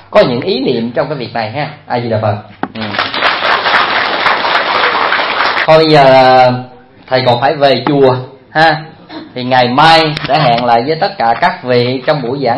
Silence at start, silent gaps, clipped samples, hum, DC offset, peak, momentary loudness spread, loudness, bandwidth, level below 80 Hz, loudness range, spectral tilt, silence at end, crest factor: 0.1 s; none; 0.5%; none; under 0.1%; 0 dBFS; 12 LU; -10 LUFS; 11 kHz; -46 dBFS; 5 LU; -6 dB/octave; 0 s; 10 dB